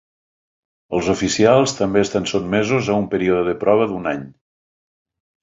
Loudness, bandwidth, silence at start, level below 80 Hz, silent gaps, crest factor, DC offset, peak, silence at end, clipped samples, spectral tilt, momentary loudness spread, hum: -18 LUFS; 8 kHz; 0.9 s; -48 dBFS; none; 18 dB; under 0.1%; -2 dBFS; 1.1 s; under 0.1%; -5 dB/octave; 9 LU; none